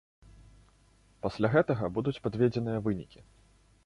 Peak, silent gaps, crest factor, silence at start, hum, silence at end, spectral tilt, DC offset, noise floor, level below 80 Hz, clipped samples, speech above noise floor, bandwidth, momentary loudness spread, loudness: -12 dBFS; none; 20 dB; 1.25 s; none; 0.65 s; -8.5 dB/octave; under 0.1%; -63 dBFS; -56 dBFS; under 0.1%; 34 dB; 11 kHz; 11 LU; -30 LUFS